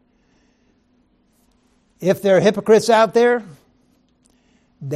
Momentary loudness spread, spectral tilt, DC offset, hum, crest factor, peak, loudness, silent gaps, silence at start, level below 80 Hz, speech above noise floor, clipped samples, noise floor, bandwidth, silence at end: 10 LU; -5 dB/octave; under 0.1%; none; 16 dB; -2 dBFS; -16 LUFS; none; 2 s; -64 dBFS; 46 dB; under 0.1%; -60 dBFS; 15 kHz; 0 s